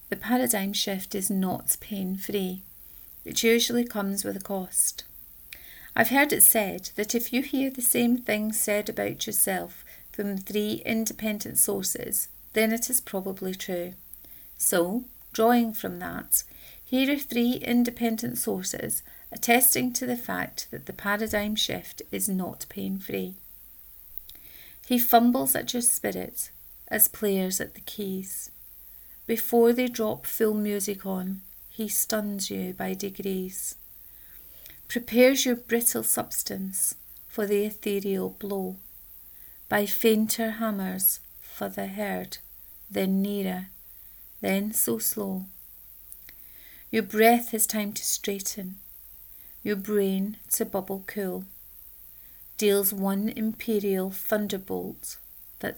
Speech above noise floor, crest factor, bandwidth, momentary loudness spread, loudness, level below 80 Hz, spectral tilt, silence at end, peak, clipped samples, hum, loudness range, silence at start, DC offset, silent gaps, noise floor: 22 dB; 24 dB; over 20 kHz; 22 LU; -26 LUFS; -60 dBFS; -3 dB/octave; 0 s; -4 dBFS; under 0.1%; none; 7 LU; 0 s; under 0.1%; none; -48 dBFS